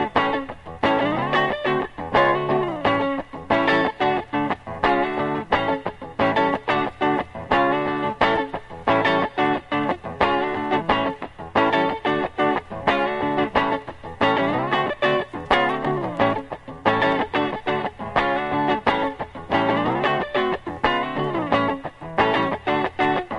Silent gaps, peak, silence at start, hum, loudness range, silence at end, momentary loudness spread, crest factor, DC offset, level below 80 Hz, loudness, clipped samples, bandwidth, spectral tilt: none; -2 dBFS; 0 s; none; 1 LU; 0 s; 6 LU; 20 dB; under 0.1%; -48 dBFS; -22 LUFS; under 0.1%; 11 kHz; -6.5 dB/octave